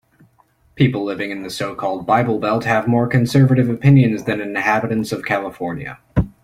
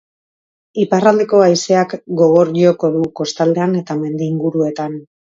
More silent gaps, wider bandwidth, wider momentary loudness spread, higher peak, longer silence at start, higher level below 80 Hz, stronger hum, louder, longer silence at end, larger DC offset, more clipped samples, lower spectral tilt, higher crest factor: neither; first, 14 kHz vs 7.8 kHz; about the same, 11 LU vs 9 LU; about the same, -2 dBFS vs 0 dBFS; about the same, 0.75 s vs 0.75 s; first, -40 dBFS vs -62 dBFS; neither; second, -18 LUFS vs -15 LUFS; second, 0.15 s vs 0.35 s; neither; neither; first, -7.5 dB/octave vs -6 dB/octave; about the same, 16 dB vs 14 dB